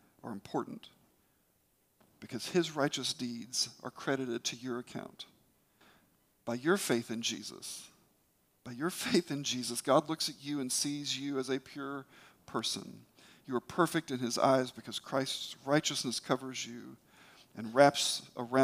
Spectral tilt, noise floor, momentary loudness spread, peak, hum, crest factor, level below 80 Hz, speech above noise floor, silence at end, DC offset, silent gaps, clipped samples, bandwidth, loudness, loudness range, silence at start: -3.5 dB/octave; -73 dBFS; 16 LU; -8 dBFS; none; 26 dB; -78 dBFS; 39 dB; 0 s; under 0.1%; none; under 0.1%; 15.5 kHz; -34 LUFS; 5 LU; 0.25 s